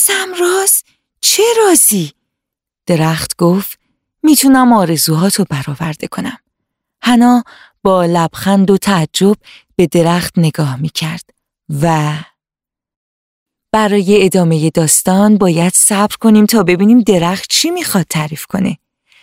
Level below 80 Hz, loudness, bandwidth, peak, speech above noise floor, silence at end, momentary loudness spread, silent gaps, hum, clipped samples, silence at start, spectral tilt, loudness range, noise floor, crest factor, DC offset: -48 dBFS; -11 LUFS; 16.5 kHz; 0 dBFS; 76 dB; 0.5 s; 12 LU; 12.96-13.46 s; none; under 0.1%; 0 s; -4.5 dB/octave; 6 LU; -87 dBFS; 12 dB; under 0.1%